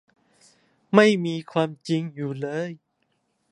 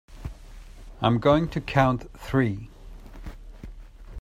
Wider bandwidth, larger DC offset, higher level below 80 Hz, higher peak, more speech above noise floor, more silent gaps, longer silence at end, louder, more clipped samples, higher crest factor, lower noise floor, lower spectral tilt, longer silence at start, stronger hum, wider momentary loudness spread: second, 10.5 kHz vs 14.5 kHz; neither; second, -74 dBFS vs -42 dBFS; first, -2 dBFS vs -6 dBFS; first, 50 dB vs 20 dB; neither; first, 0.75 s vs 0 s; about the same, -23 LUFS vs -24 LUFS; neither; about the same, 24 dB vs 20 dB; first, -72 dBFS vs -43 dBFS; second, -6 dB/octave vs -7.5 dB/octave; first, 0.9 s vs 0.1 s; neither; second, 14 LU vs 24 LU